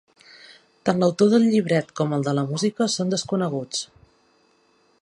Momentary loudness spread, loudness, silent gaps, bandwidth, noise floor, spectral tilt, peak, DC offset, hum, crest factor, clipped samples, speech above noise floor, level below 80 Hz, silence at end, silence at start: 10 LU; -22 LUFS; none; 11 kHz; -62 dBFS; -5.5 dB/octave; -4 dBFS; under 0.1%; none; 20 dB; under 0.1%; 41 dB; -66 dBFS; 1.2 s; 0.85 s